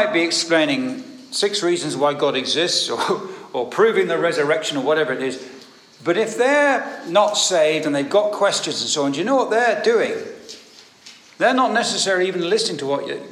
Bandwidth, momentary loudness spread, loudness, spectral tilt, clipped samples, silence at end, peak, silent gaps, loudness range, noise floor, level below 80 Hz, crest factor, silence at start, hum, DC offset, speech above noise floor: 14 kHz; 11 LU; -19 LUFS; -2.5 dB/octave; under 0.1%; 0 s; -4 dBFS; none; 3 LU; -46 dBFS; -78 dBFS; 16 dB; 0 s; none; under 0.1%; 27 dB